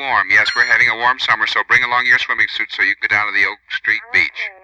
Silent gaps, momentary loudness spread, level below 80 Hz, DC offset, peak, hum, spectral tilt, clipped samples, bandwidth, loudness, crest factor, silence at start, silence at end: none; 6 LU; -56 dBFS; under 0.1%; -2 dBFS; none; -1.5 dB/octave; under 0.1%; 9.8 kHz; -14 LUFS; 14 dB; 0 s; 0.1 s